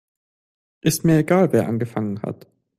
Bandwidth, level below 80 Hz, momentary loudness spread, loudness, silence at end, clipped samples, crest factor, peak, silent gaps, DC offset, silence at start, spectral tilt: 16 kHz; -54 dBFS; 14 LU; -20 LUFS; 0.45 s; under 0.1%; 16 dB; -4 dBFS; none; under 0.1%; 0.85 s; -6 dB/octave